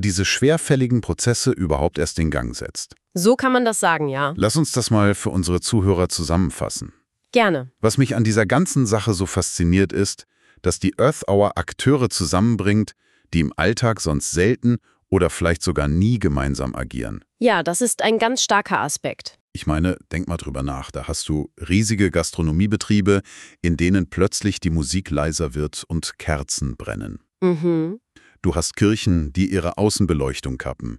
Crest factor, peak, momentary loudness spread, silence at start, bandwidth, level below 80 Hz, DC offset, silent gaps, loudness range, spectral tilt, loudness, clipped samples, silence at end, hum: 16 dB; -4 dBFS; 10 LU; 0 s; 13.5 kHz; -36 dBFS; under 0.1%; 19.40-19.48 s; 4 LU; -5 dB/octave; -20 LUFS; under 0.1%; 0 s; none